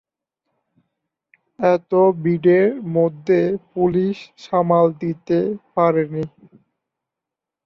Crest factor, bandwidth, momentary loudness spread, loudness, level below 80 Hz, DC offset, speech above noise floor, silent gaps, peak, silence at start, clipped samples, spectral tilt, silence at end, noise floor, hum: 18 dB; 6.6 kHz; 9 LU; -19 LUFS; -60 dBFS; under 0.1%; 68 dB; none; -2 dBFS; 1.6 s; under 0.1%; -9 dB/octave; 1.4 s; -85 dBFS; none